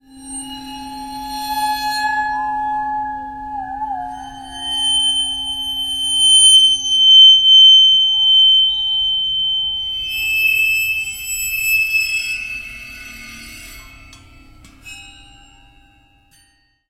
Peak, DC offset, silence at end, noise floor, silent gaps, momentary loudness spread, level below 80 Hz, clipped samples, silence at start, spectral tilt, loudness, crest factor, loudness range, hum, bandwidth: 0 dBFS; under 0.1%; 1.8 s; -57 dBFS; none; 25 LU; -46 dBFS; under 0.1%; 0.15 s; 2 dB/octave; -11 LUFS; 16 dB; 15 LU; none; 16.5 kHz